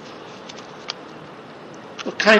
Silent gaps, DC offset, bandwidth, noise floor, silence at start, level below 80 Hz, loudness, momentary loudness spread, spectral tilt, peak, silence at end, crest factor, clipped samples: none; under 0.1%; 9.4 kHz; -39 dBFS; 0 s; -70 dBFS; -31 LUFS; 8 LU; -3.5 dB/octave; -2 dBFS; 0 s; 22 dB; under 0.1%